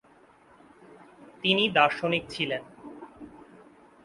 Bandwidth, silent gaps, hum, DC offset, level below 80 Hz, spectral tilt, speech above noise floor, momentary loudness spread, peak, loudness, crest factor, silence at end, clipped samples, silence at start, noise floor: 11.5 kHz; none; none; under 0.1%; -66 dBFS; -5 dB/octave; 32 dB; 24 LU; -6 dBFS; -25 LUFS; 24 dB; 0.7 s; under 0.1%; 1.2 s; -58 dBFS